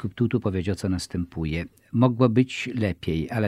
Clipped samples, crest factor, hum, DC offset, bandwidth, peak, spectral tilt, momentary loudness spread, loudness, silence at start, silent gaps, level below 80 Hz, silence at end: under 0.1%; 20 dB; none; under 0.1%; 13 kHz; -4 dBFS; -7 dB/octave; 9 LU; -25 LUFS; 0 s; none; -44 dBFS; 0 s